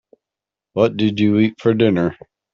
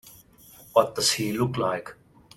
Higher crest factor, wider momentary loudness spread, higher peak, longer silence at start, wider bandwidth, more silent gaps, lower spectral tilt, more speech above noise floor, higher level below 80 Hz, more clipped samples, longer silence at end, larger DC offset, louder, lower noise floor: second, 16 dB vs 22 dB; second, 6 LU vs 10 LU; first, -2 dBFS vs -6 dBFS; first, 0.75 s vs 0.05 s; second, 7 kHz vs 17 kHz; neither; first, -6 dB/octave vs -3.5 dB/octave; first, 71 dB vs 27 dB; about the same, -56 dBFS vs -60 dBFS; neither; about the same, 0.4 s vs 0.45 s; neither; first, -17 LUFS vs -25 LUFS; first, -87 dBFS vs -52 dBFS